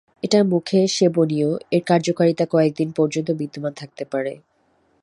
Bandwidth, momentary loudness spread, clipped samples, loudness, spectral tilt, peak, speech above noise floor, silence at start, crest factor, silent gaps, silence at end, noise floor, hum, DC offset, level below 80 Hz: 11.5 kHz; 10 LU; under 0.1%; -20 LUFS; -6 dB/octave; -4 dBFS; 43 dB; 0.25 s; 18 dB; none; 0.65 s; -63 dBFS; none; under 0.1%; -66 dBFS